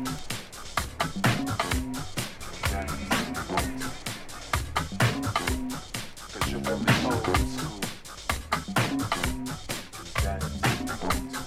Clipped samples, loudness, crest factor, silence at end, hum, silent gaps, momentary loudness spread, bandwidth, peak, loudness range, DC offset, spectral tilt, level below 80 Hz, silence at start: under 0.1%; -29 LUFS; 20 dB; 0 s; none; none; 10 LU; 17 kHz; -8 dBFS; 3 LU; under 0.1%; -4 dB/octave; -38 dBFS; 0 s